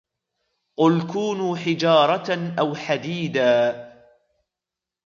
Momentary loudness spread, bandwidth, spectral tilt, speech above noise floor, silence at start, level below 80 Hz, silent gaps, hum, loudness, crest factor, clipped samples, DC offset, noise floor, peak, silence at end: 8 LU; 7.4 kHz; -6 dB/octave; 67 dB; 0.8 s; -70 dBFS; none; none; -21 LUFS; 20 dB; under 0.1%; under 0.1%; -87 dBFS; -4 dBFS; 1.15 s